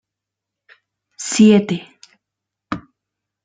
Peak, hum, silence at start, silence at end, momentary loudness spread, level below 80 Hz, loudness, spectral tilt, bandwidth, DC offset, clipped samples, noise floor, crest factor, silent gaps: -2 dBFS; none; 1.2 s; 0.65 s; 18 LU; -58 dBFS; -15 LUFS; -5 dB/octave; 9.4 kHz; under 0.1%; under 0.1%; -84 dBFS; 18 dB; none